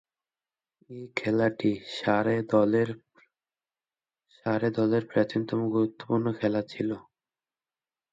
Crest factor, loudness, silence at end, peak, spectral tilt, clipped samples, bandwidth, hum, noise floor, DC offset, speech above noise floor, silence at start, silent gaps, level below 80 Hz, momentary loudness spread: 20 dB; -27 LUFS; 1.1 s; -10 dBFS; -7.5 dB/octave; under 0.1%; 7.8 kHz; none; under -90 dBFS; under 0.1%; over 63 dB; 0.9 s; none; -68 dBFS; 10 LU